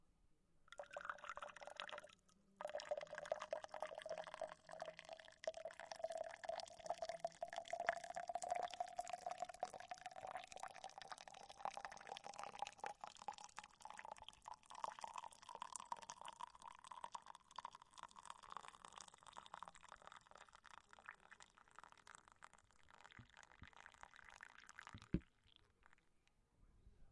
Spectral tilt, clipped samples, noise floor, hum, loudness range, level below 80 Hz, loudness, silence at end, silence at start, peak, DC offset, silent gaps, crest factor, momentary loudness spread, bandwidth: -3.5 dB/octave; under 0.1%; -78 dBFS; none; 14 LU; -74 dBFS; -53 LUFS; 0 s; 0.05 s; -20 dBFS; under 0.1%; none; 34 dB; 15 LU; 11.5 kHz